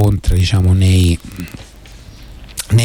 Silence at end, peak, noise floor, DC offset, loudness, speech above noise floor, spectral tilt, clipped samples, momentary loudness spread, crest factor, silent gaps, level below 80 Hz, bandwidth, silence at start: 0 s; -2 dBFS; -37 dBFS; under 0.1%; -14 LUFS; 24 dB; -6 dB/octave; under 0.1%; 18 LU; 12 dB; none; -24 dBFS; 18 kHz; 0 s